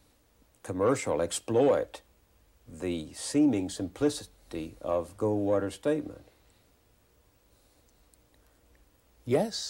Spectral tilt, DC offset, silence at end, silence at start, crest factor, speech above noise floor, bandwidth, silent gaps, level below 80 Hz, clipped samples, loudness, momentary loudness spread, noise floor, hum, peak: -5 dB/octave; under 0.1%; 0 s; 0.65 s; 18 dB; 36 dB; 16.5 kHz; none; -60 dBFS; under 0.1%; -30 LUFS; 15 LU; -65 dBFS; none; -14 dBFS